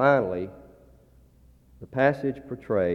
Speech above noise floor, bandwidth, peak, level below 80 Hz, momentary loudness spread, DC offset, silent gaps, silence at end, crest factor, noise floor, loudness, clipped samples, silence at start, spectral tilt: 32 dB; 6.6 kHz; -6 dBFS; -58 dBFS; 14 LU; under 0.1%; none; 0 s; 20 dB; -56 dBFS; -27 LUFS; under 0.1%; 0 s; -8.5 dB/octave